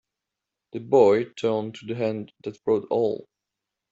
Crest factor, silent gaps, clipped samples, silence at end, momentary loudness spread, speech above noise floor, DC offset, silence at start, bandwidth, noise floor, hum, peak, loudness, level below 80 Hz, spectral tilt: 20 dB; none; under 0.1%; 0.7 s; 18 LU; 62 dB; under 0.1%; 0.75 s; 7.8 kHz; -86 dBFS; none; -6 dBFS; -24 LUFS; -68 dBFS; -7 dB/octave